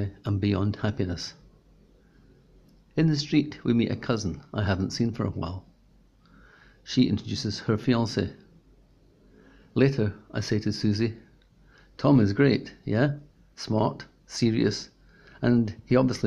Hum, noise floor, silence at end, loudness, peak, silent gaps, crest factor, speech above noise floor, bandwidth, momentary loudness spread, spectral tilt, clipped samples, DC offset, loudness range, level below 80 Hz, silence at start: none; -59 dBFS; 0 s; -26 LUFS; -8 dBFS; none; 20 dB; 34 dB; 10.5 kHz; 12 LU; -6.5 dB/octave; under 0.1%; under 0.1%; 4 LU; -54 dBFS; 0 s